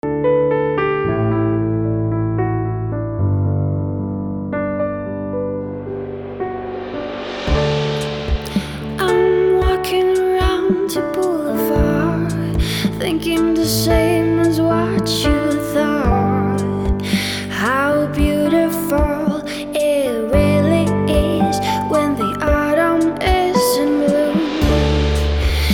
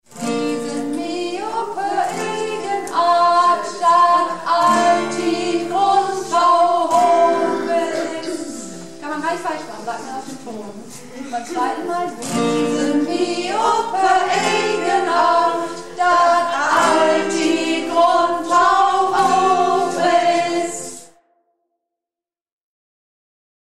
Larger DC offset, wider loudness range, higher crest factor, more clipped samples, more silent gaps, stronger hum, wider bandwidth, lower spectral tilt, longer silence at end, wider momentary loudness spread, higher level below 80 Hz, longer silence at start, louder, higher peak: second, under 0.1% vs 0.8%; second, 6 LU vs 10 LU; about the same, 14 dB vs 14 dB; neither; neither; neither; first, over 20 kHz vs 13.5 kHz; first, -6 dB/octave vs -3.5 dB/octave; second, 0 s vs 2.6 s; second, 8 LU vs 14 LU; first, -26 dBFS vs -60 dBFS; about the same, 0.05 s vs 0.1 s; about the same, -18 LUFS vs -17 LUFS; about the same, -4 dBFS vs -4 dBFS